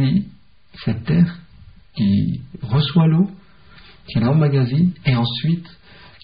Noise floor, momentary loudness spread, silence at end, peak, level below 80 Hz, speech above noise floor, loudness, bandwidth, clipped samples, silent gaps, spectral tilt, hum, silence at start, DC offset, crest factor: -47 dBFS; 11 LU; 0.55 s; -6 dBFS; -44 dBFS; 29 dB; -19 LUFS; 5.2 kHz; under 0.1%; none; -7 dB/octave; none; 0 s; 0.4%; 14 dB